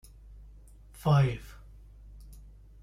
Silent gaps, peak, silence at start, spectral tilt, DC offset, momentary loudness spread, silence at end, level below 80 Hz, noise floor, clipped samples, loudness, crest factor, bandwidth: none; -14 dBFS; 1.05 s; -8 dB/octave; under 0.1%; 27 LU; 0.55 s; -50 dBFS; -52 dBFS; under 0.1%; -28 LUFS; 18 dB; 14 kHz